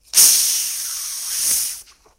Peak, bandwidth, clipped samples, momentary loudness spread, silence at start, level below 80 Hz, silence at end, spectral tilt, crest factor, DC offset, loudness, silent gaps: 0 dBFS; 17 kHz; under 0.1%; 14 LU; 0.15 s; -60 dBFS; 0.35 s; 3.5 dB/octave; 20 dB; under 0.1%; -16 LUFS; none